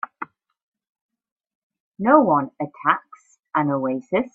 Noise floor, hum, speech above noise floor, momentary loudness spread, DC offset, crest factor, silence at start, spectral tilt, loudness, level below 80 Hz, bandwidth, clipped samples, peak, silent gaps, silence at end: -39 dBFS; none; 19 dB; 16 LU; under 0.1%; 22 dB; 0.2 s; -8.5 dB/octave; -21 LUFS; -68 dBFS; 7.6 kHz; under 0.1%; 0 dBFS; 0.63-0.72 s, 0.89-0.95 s, 1.02-1.09 s, 1.32-1.36 s, 1.55-1.70 s, 1.80-1.92 s; 0.05 s